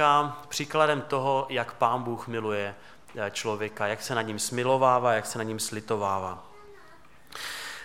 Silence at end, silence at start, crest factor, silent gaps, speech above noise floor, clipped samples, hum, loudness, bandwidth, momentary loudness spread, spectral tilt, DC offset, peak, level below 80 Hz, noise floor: 0 s; 0 s; 20 dB; none; 27 dB; under 0.1%; none; -28 LUFS; 17 kHz; 13 LU; -4 dB/octave; 0.3%; -8 dBFS; -66 dBFS; -55 dBFS